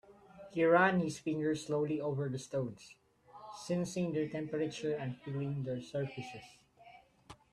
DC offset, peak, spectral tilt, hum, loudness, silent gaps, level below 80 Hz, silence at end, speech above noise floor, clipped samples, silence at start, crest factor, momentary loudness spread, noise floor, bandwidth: under 0.1%; -14 dBFS; -6 dB/octave; none; -35 LUFS; none; -72 dBFS; 0.2 s; 25 dB; under 0.1%; 0.1 s; 22 dB; 19 LU; -60 dBFS; 13 kHz